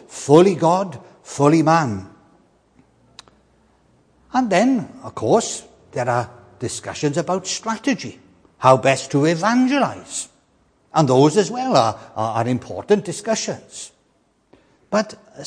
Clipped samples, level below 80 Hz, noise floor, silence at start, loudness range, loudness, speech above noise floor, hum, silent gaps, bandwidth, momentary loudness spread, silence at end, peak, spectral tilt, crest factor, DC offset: under 0.1%; -62 dBFS; -62 dBFS; 0.1 s; 6 LU; -19 LUFS; 44 dB; none; none; 10.5 kHz; 17 LU; 0 s; 0 dBFS; -5.5 dB/octave; 20 dB; under 0.1%